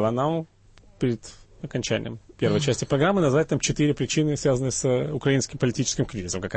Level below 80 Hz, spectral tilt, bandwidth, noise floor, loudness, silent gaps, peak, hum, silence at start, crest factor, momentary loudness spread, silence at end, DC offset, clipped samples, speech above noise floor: -48 dBFS; -5 dB/octave; 8.8 kHz; -50 dBFS; -24 LUFS; none; -10 dBFS; none; 0 s; 14 dB; 9 LU; 0 s; under 0.1%; under 0.1%; 27 dB